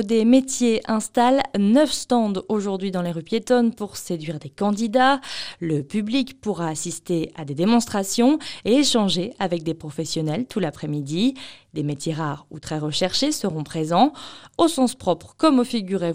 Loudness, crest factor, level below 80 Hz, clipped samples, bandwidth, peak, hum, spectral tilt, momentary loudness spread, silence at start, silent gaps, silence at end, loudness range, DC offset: -22 LUFS; 18 dB; -56 dBFS; under 0.1%; 15.5 kHz; -4 dBFS; none; -5 dB/octave; 11 LU; 0 s; none; 0 s; 4 LU; 0.4%